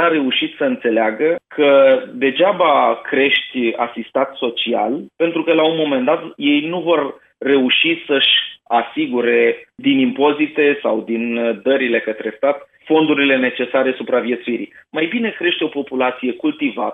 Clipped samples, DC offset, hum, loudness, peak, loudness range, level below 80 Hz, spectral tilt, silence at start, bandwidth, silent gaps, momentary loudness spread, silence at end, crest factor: under 0.1%; under 0.1%; none; -16 LUFS; -2 dBFS; 3 LU; -72 dBFS; -7.5 dB/octave; 0 s; 4 kHz; none; 7 LU; 0 s; 16 dB